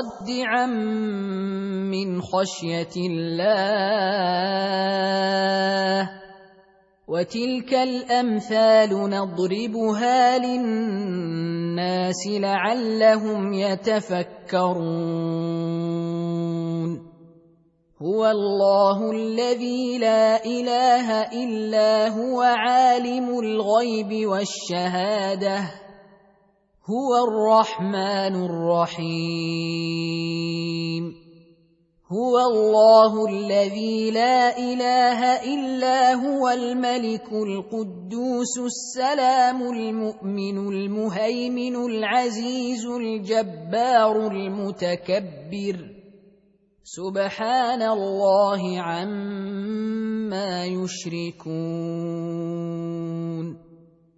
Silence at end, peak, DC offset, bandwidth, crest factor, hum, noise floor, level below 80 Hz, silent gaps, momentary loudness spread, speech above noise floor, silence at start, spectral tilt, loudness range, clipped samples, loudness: 0.45 s; -4 dBFS; under 0.1%; 8 kHz; 18 dB; none; -62 dBFS; -68 dBFS; none; 10 LU; 40 dB; 0 s; -5.5 dB/octave; 7 LU; under 0.1%; -22 LUFS